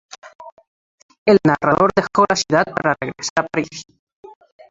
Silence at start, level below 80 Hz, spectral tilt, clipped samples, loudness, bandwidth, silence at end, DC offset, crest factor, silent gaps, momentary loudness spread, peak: 0.25 s; -54 dBFS; -4.5 dB/octave; under 0.1%; -17 LUFS; 7.8 kHz; 0.9 s; under 0.1%; 18 dB; 0.35-0.39 s, 0.52-0.57 s, 0.67-1.09 s, 1.18-1.26 s, 3.30-3.36 s; 11 LU; 0 dBFS